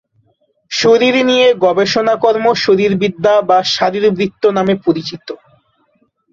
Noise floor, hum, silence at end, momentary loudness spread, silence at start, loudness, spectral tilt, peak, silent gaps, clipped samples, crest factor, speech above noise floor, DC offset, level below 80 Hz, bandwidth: -59 dBFS; none; 0.95 s; 10 LU; 0.7 s; -12 LUFS; -4.5 dB/octave; 0 dBFS; none; under 0.1%; 12 dB; 47 dB; under 0.1%; -54 dBFS; 7.6 kHz